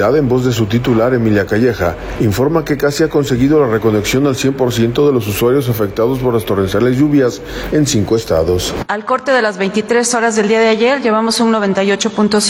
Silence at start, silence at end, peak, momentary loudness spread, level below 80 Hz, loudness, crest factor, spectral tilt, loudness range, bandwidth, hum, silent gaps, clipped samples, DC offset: 0 s; 0 s; -2 dBFS; 5 LU; -36 dBFS; -13 LUFS; 10 dB; -5 dB/octave; 1 LU; 17.5 kHz; none; none; under 0.1%; under 0.1%